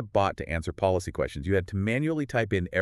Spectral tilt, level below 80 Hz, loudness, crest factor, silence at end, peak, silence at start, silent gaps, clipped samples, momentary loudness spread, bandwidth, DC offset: -6.5 dB/octave; -46 dBFS; -28 LUFS; 16 dB; 0 s; -10 dBFS; 0 s; none; under 0.1%; 5 LU; 12.5 kHz; under 0.1%